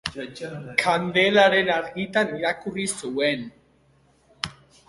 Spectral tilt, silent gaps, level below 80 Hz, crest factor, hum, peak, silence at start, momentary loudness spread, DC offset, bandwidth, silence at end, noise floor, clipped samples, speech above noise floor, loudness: -3.5 dB/octave; none; -60 dBFS; 22 dB; none; -2 dBFS; 0.05 s; 16 LU; under 0.1%; 11.5 kHz; 0.35 s; -60 dBFS; under 0.1%; 37 dB; -23 LUFS